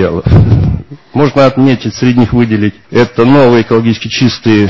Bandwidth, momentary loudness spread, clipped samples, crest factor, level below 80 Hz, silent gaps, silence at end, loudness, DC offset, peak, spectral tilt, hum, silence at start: 7.6 kHz; 6 LU; 0.8%; 8 dB; -24 dBFS; none; 0 s; -9 LUFS; under 0.1%; 0 dBFS; -7.5 dB/octave; none; 0 s